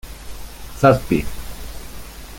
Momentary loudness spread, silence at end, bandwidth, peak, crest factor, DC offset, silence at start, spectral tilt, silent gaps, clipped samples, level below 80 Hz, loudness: 22 LU; 0 s; 17 kHz; -2 dBFS; 20 dB; under 0.1%; 0.05 s; -6.5 dB/octave; none; under 0.1%; -34 dBFS; -17 LUFS